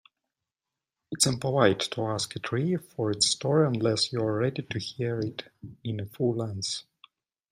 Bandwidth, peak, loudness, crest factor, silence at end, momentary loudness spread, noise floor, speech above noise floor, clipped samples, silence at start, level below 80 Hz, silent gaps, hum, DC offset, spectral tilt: 15.5 kHz; -6 dBFS; -27 LUFS; 22 dB; 0.7 s; 11 LU; -89 dBFS; 61 dB; under 0.1%; 1.1 s; -66 dBFS; none; none; under 0.1%; -4.5 dB/octave